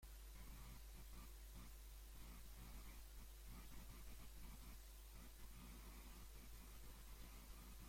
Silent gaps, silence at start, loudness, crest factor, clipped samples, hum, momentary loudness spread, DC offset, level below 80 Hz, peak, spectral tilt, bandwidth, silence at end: none; 0 s; -61 LUFS; 12 dB; under 0.1%; none; 1 LU; under 0.1%; -60 dBFS; -46 dBFS; -3.5 dB/octave; 16.5 kHz; 0 s